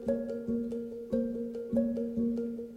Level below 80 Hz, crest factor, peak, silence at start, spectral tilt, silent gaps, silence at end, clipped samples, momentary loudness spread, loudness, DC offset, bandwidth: -58 dBFS; 16 dB; -18 dBFS; 0 s; -9 dB/octave; none; 0 s; under 0.1%; 5 LU; -34 LUFS; under 0.1%; 5.2 kHz